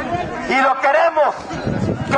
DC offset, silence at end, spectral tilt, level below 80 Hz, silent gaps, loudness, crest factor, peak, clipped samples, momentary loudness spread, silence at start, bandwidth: under 0.1%; 0 s; -6 dB/octave; -42 dBFS; none; -17 LUFS; 14 dB; -2 dBFS; under 0.1%; 9 LU; 0 s; 10 kHz